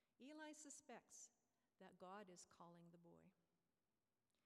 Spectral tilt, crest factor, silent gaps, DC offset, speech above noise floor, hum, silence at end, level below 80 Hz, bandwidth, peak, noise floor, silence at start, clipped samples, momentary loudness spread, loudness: -3 dB/octave; 18 dB; none; under 0.1%; over 25 dB; none; 1.05 s; under -90 dBFS; 13 kHz; -48 dBFS; under -90 dBFS; 0.2 s; under 0.1%; 7 LU; -63 LUFS